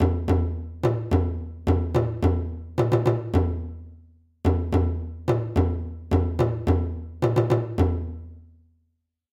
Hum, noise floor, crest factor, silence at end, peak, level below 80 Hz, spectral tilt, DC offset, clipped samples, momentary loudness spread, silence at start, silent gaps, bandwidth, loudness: none; -74 dBFS; 16 dB; 0.9 s; -8 dBFS; -34 dBFS; -9 dB/octave; under 0.1%; under 0.1%; 9 LU; 0 s; none; 7.6 kHz; -25 LUFS